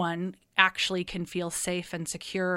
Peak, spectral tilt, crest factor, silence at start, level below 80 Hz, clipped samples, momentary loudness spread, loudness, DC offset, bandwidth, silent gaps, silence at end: -4 dBFS; -3 dB/octave; 26 dB; 0 s; -58 dBFS; under 0.1%; 11 LU; -28 LUFS; under 0.1%; 16 kHz; none; 0 s